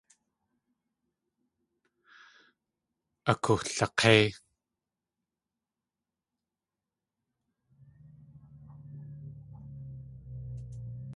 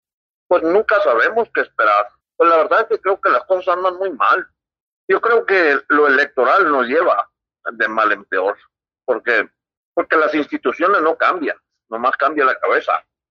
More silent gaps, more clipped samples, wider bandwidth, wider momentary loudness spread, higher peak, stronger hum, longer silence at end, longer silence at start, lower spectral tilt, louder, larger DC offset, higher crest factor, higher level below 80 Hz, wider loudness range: second, none vs 4.80-5.08 s, 9.77-9.93 s; neither; first, 11.5 kHz vs 6.8 kHz; first, 25 LU vs 10 LU; about the same, -6 dBFS vs -4 dBFS; neither; second, 0 s vs 0.3 s; first, 3.25 s vs 0.5 s; about the same, -4.5 dB/octave vs -5 dB/octave; second, -26 LUFS vs -16 LUFS; neither; first, 30 dB vs 14 dB; first, -60 dBFS vs -66 dBFS; first, 21 LU vs 3 LU